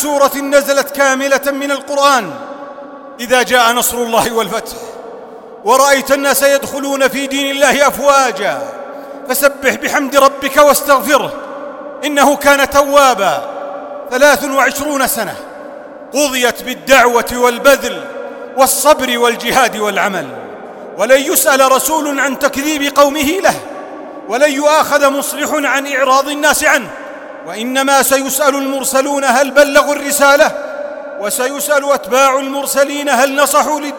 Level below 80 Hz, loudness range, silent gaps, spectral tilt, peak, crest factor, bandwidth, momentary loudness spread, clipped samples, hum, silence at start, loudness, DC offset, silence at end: -48 dBFS; 2 LU; none; -1.5 dB/octave; 0 dBFS; 12 dB; 17.5 kHz; 17 LU; 0.3%; none; 0 s; -12 LUFS; under 0.1%; 0 s